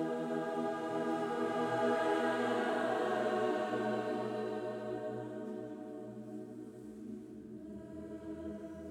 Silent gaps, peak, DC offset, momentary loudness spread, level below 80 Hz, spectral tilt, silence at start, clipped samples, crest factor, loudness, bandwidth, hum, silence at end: none; -20 dBFS; under 0.1%; 15 LU; -72 dBFS; -6 dB/octave; 0 s; under 0.1%; 16 dB; -37 LUFS; 16 kHz; none; 0 s